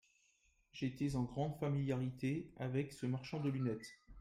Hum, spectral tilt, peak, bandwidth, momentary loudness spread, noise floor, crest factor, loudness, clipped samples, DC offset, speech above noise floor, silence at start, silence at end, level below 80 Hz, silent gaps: none; -7.5 dB/octave; -26 dBFS; 13 kHz; 6 LU; -76 dBFS; 14 dB; -41 LUFS; under 0.1%; under 0.1%; 36 dB; 0.75 s; 0 s; -64 dBFS; none